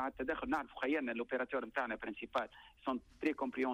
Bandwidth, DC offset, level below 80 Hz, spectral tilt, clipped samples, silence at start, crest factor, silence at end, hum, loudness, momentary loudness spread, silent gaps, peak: 12 kHz; under 0.1%; -66 dBFS; -5.5 dB/octave; under 0.1%; 0 s; 14 dB; 0 s; none; -39 LUFS; 5 LU; none; -24 dBFS